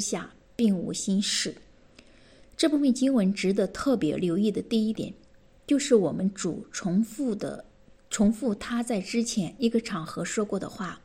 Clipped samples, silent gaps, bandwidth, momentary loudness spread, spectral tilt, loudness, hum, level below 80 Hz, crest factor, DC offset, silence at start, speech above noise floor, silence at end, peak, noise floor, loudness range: under 0.1%; none; 15.5 kHz; 11 LU; -5 dB/octave; -27 LUFS; none; -56 dBFS; 18 dB; under 0.1%; 0 s; 28 dB; 0.05 s; -8 dBFS; -54 dBFS; 3 LU